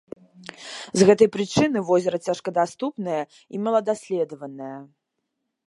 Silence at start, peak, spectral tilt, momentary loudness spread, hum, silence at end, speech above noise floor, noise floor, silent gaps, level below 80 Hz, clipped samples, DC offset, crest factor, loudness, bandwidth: 0.6 s; -2 dBFS; -5.5 dB/octave; 20 LU; none; 0.85 s; 57 dB; -79 dBFS; none; -62 dBFS; under 0.1%; under 0.1%; 22 dB; -22 LUFS; 11.5 kHz